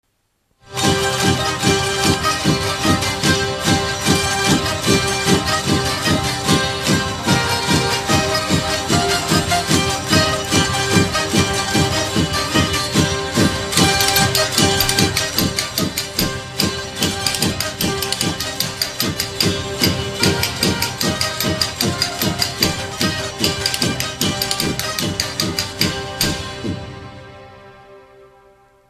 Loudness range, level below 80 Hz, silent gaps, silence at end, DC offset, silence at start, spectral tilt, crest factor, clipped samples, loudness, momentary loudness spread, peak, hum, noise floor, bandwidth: 4 LU; -38 dBFS; none; 0.65 s; under 0.1%; 0.65 s; -3.5 dB/octave; 18 dB; under 0.1%; -17 LUFS; 5 LU; 0 dBFS; none; -66 dBFS; 15 kHz